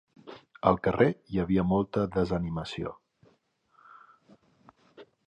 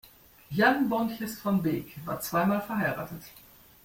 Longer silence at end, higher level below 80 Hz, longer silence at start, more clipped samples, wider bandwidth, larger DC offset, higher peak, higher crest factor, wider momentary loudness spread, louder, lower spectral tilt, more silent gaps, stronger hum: second, 0.25 s vs 0.45 s; first, -50 dBFS vs -62 dBFS; second, 0.25 s vs 0.5 s; neither; second, 8.4 kHz vs 16.5 kHz; neither; about the same, -6 dBFS vs -8 dBFS; about the same, 24 dB vs 20 dB; first, 16 LU vs 13 LU; about the same, -28 LUFS vs -28 LUFS; first, -8 dB/octave vs -6 dB/octave; neither; neither